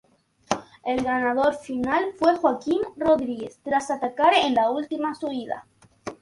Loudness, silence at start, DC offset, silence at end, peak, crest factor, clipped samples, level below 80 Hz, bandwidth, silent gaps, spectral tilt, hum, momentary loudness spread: -24 LUFS; 0.5 s; under 0.1%; 0.1 s; -4 dBFS; 20 dB; under 0.1%; -58 dBFS; 11.5 kHz; none; -4 dB/octave; none; 12 LU